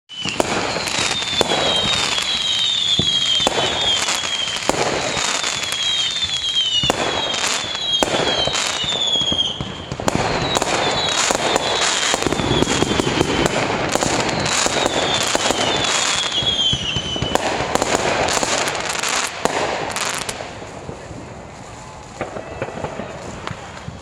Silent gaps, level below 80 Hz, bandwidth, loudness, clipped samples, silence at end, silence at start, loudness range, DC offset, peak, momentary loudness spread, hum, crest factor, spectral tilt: none; -42 dBFS; 16.5 kHz; -18 LUFS; under 0.1%; 0 s; 0.1 s; 7 LU; under 0.1%; 0 dBFS; 14 LU; none; 20 dB; -2 dB/octave